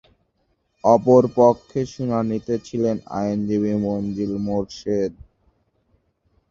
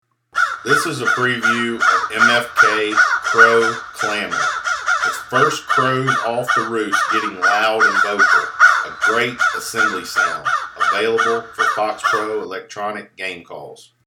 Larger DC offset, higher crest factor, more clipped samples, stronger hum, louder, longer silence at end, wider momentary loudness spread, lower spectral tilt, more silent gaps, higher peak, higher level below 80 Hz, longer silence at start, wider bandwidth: neither; about the same, 20 dB vs 18 dB; neither; neither; second, -21 LUFS vs -16 LUFS; first, 1.4 s vs 0.25 s; about the same, 11 LU vs 12 LU; first, -8 dB/octave vs -3 dB/octave; neither; about the same, -2 dBFS vs 0 dBFS; first, -52 dBFS vs -60 dBFS; first, 0.85 s vs 0.35 s; second, 7.6 kHz vs 18 kHz